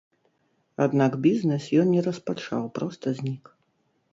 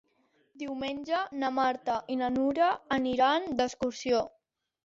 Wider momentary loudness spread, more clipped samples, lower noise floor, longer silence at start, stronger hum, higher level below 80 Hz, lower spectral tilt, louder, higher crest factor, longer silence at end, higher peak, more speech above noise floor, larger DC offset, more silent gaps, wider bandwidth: about the same, 11 LU vs 9 LU; neither; about the same, -70 dBFS vs -70 dBFS; first, 0.8 s vs 0.55 s; neither; second, -70 dBFS vs -64 dBFS; first, -7.5 dB/octave vs -4 dB/octave; first, -25 LUFS vs -30 LUFS; about the same, 18 dB vs 16 dB; first, 0.75 s vs 0.55 s; first, -8 dBFS vs -14 dBFS; first, 46 dB vs 41 dB; neither; neither; about the same, 7.8 kHz vs 7.8 kHz